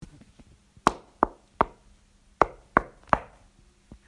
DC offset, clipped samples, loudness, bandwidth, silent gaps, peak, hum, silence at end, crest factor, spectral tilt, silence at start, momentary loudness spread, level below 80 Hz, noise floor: under 0.1%; under 0.1%; -28 LUFS; 11.5 kHz; none; 0 dBFS; none; 0.85 s; 30 dB; -5 dB/octave; 0.85 s; 2 LU; -48 dBFS; -59 dBFS